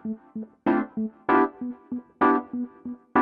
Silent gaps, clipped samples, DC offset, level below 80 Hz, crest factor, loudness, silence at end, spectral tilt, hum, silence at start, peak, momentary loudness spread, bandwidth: none; under 0.1%; under 0.1%; -64 dBFS; 18 dB; -26 LUFS; 0 s; -9 dB/octave; none; 0.05 s; -8 dBFS; 14 LU; 5 kHz